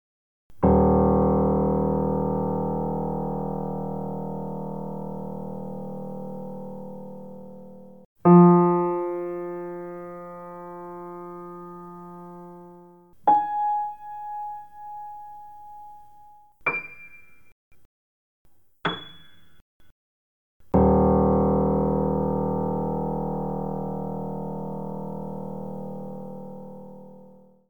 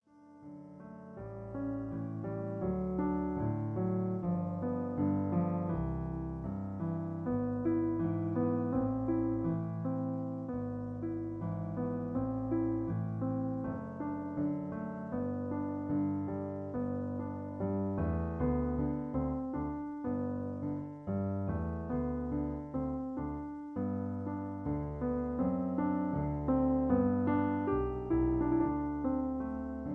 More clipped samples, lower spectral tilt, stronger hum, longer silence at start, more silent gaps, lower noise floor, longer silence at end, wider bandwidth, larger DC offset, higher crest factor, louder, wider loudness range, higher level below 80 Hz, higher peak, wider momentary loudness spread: neither; second, -10.5 dB/octave vs -12 dB/octave; neither; first, 0.55 s vs 0.15 s; first, 8.06-8.15 s, 17.52-17.71 s, 17.85-18.45 s, 19.61-19.80 s, 19.92-20.60 s vs none; about the same, -54 dBFS vs -55 dBFS; about the same, 0 s vs 0 s; first, 3.8 kHz vs 3.2 kHz; first, 0.5% vs under 0.1%; about the same, 20 dB vs 16 dB; first, -24 LUFS vs -35 LUFS; first, 15 LU vs 5 LU; first, -42 dBFS vs -50 dBFS; first, -6 dBFS vs -18 dBFS; first, 22 LU vs 8 LU